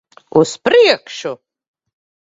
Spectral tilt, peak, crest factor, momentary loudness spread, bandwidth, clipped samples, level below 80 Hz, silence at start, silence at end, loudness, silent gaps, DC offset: -4 dB/octave; 0 dBFS; 16 dB; 16 LU; 7.8 kHz; under 0.1%; -60 dBFS; 0.35 s; 1 s; -13 LUFS; none; under 0.1%